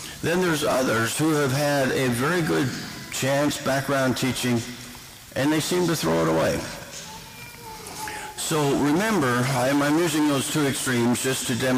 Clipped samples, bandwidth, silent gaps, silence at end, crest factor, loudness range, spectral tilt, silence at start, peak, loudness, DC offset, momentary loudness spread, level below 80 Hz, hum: under 0.1%; 16 kHz; none; 0 s; 8 dB; 4 LU; -4.5 dB/octave; 0 s; -16 dBFS; -23 LUFS; under 0.1%; 14 LU; -52 dBFS; none